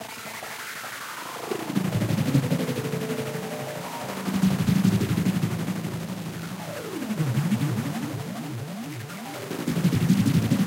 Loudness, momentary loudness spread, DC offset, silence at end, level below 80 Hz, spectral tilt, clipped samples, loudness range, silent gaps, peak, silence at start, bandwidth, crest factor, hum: -27 LUFS; 12 LU; under 0.1%; 0 s; -54 dBFS; -6 dB/octave; under 0.1%; 4 LU; none; -8 dBFS; 0 s; 16 kHz; 18 dB; none